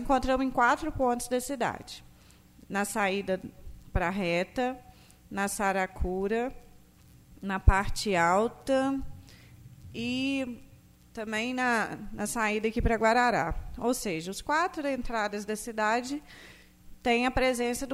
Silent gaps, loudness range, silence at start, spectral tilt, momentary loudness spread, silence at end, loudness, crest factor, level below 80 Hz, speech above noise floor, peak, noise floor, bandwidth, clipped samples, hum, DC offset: none; 4 LU; 0 s; -4.5 dB/octave; 13 LU; 0 s; -29 LUFS; 22 dB; -40 dBFS; 28 dB; -6 dBFS; -56 dBFS; 16 kHz; under 0.1%; none; under 0.1%